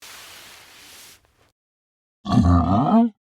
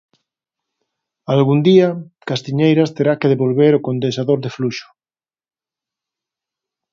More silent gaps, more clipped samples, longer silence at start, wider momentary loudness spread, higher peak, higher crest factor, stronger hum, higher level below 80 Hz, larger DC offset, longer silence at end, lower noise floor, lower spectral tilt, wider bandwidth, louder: first, 1.52-2.24 s vs none; neither; second, 0.05 s vs 1.3 s; first, 24 LU vs 12 LU; second, -4 dBFS vs 0 dBFS; about the same, 18 dB vs 18 dB; neither; first, -42 dBFS vs -64 dBFS; neither; second, 0.25 s vs 2.1 s; second, -51 dBFS vs under -90 dBFS; about the same, -8 dB/octave vs -7.5 dB/octave; first, 15.5 kHz vs 7.4 kHz; about the same, -18 LUFS vs -16 LUFS